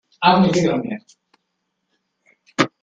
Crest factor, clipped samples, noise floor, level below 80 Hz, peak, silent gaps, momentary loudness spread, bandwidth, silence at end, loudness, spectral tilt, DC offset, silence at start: 20 dB; under 0.1%; -74 dBFS; -58 dBFS; 0 dBFS; none; 16 LU; 9.2 kHz; 0.15 s; -18 LUFS; -5.5 dB/octave; under 0.1%; 0.2 s